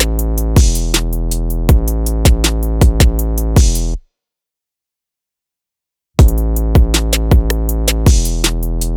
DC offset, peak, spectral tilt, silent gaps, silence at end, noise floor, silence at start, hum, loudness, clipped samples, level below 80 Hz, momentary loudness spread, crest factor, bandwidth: under 0.1%; -2 dBFS; -5 dB/octave; none; 0 s; -84 dBFS; 0 s; none; -14 LUFS; under 0.1%; -14 dBFS; 7 LU; 12 dB; 19.5 kHz